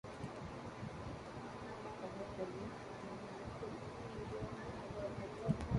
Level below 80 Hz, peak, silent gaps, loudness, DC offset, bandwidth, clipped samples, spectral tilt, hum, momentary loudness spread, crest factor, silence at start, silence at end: -58 dBFS; -22 dBFS; none; -47 LUFS; under 0.1%; 11.5 kHz; under 0.1%; -7 dB/octave; none; 4 LU; 24 dB; 0.05 s; 0 s